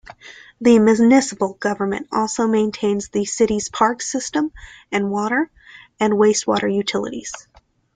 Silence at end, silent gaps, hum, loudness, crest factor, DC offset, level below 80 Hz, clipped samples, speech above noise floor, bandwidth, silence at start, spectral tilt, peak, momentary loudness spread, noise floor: 0.55 s; none; none; -19 LUFS; 16 dB; under 0.1%; -52 dBFS; under 0.1%; 24 dB; 9.4 kHz; 0.25 s; -4.5 dB/octave; -2 dBFS; 12 LU; -42 dBFS